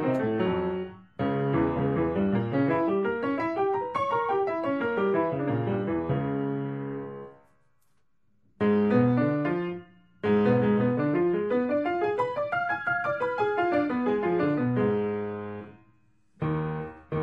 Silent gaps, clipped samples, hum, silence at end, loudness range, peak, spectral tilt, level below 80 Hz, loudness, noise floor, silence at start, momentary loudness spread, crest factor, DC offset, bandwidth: none; under 0.1%; none; 0 s; 4 LU; -10 dBFS; -9.5 dB/octave; -56 dBFS; -27 LUFS; -74 dBFS; 0 s; 11 LU; 16 dB; under 0.1%; 6 kHz